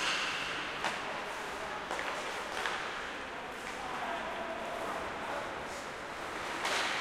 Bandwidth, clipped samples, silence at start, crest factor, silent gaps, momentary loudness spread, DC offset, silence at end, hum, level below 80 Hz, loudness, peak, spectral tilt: 16.5 kHz; under 0.1%; 0 s; 22 dB; none; 8 LU; under 0.1%; 0 s; none; -62 dBFS; -37 LUFS; -16 dBFS; -2 dB/octave